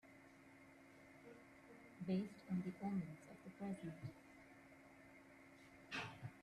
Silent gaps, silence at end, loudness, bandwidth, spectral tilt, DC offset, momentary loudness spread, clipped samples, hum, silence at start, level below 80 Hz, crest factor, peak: none; 0 s; -49 LUFS; 12.5 kHz; -7 dB/octave; under 0.1%; 19 LU; under 0.1%; none; 0.05 s; -80 dBFS; 18 dB; -34 dBFS